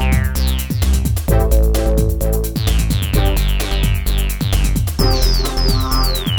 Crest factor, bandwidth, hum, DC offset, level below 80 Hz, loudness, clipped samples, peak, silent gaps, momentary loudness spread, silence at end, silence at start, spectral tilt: 14 dB; 20 kHz; none; under 0.1%; -16 dBFS; -17 LUFS; under 0.1%; -2 dBFS; none; 4 LU; 0 s; 0 s; -5 dB/octave